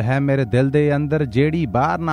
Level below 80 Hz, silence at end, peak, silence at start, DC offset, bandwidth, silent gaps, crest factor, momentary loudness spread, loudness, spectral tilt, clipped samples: -42 dBFS; 0 s; -4 dBFS; 0 s; under 0.1%; 10 kHz; none; 14 dB; 2 LU; -18 LUFS; -8.5 dB/octave; under 0.1%